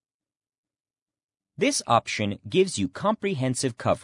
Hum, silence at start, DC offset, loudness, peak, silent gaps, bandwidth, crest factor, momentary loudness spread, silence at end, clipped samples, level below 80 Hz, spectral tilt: none; 1.6 s; under 0.1%; -25 LUFS; -6 dBFS; none; 11 kHz; 20 dB; 4 LU; 0 s; under 0.1%; -66 dBFS; -4.5 dB/octave